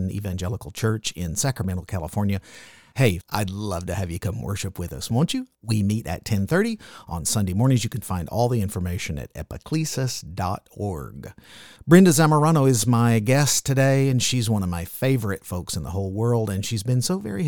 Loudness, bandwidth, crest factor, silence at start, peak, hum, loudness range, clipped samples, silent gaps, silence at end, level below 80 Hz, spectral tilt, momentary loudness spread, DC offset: -23 LUFS; 19 kHz; 20 dB; 0 s; -2 dBFS; none; 8 LU; under 0.1%; none; 0 s; -46 dBFS; -5.5 dB/octave; 12 LU; 0.2%